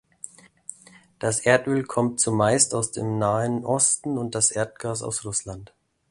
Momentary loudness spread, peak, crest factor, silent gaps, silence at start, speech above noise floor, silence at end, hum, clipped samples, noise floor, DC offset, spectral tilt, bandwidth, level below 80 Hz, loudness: 21 LU; -4 dBFS; 20 dB; none; 0.25 s; 29 dB; 0.45 s; none; under 0.1%; -52 dBFS; under 0.1%; -4 dB/octave; 11.5 kHz; -56 dBFS; -23 LUFS